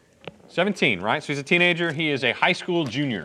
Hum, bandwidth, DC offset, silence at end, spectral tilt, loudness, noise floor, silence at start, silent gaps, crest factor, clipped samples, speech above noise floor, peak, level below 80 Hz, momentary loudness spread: none; 11.5 kHz; under 0.1%; 0 s; -5 dB/octave; -22 LUFS; -44 dBFS; 0.25 s; none; 20 dB; under 0.1%; 22 dB; -4 dBFS; -70 dBFS; 7 LU